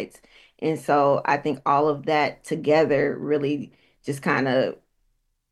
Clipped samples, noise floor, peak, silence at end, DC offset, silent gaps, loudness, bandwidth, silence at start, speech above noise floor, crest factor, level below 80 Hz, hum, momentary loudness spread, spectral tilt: under 0.1%; -70 dBFS; -6 dBFS; 0.75 s; under 0.1%; none; -23 LUFS; 12.5 kHz; 0 s; 47 dB; 18 dB; -62 dBFS; none; 11 LU; -6 dB/octave